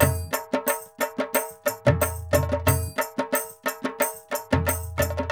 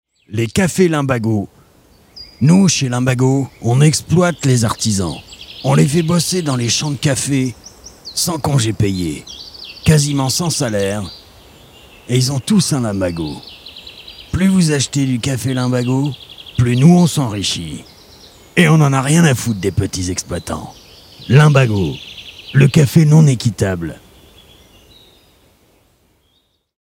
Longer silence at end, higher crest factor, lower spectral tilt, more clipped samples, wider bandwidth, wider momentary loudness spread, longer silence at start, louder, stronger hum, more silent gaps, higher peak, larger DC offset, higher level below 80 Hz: second, 0 s vs 2.95 s; first, 22 dB vs 16 dB; about the same, -5 dB/octave vs -5.5 dB/octave; neither; first, over 20 kHz vs 16.5 kHz; second, 7 LU vs 20 LU; second, 0 s vs 0.3 s; second, -26 LUFS vs -15 LUFS; neither; neither; about the same, -2 dBFS vs 0 dBFS; neither; about the same, -40 dBFS vs -42 dBFS